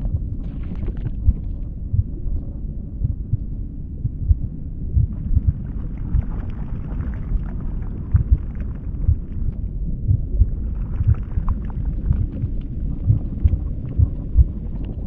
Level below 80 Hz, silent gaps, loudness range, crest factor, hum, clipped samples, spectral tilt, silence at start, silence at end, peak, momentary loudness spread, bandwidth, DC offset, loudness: -24 dBFS; none; 3 LU; 18 dB; none; under 0.1%; -12.5 dB/octave; 0 s; 0 s; -2 dBFS; 9 LU; 2.9 kHz; under 0.1%; -25 LUFS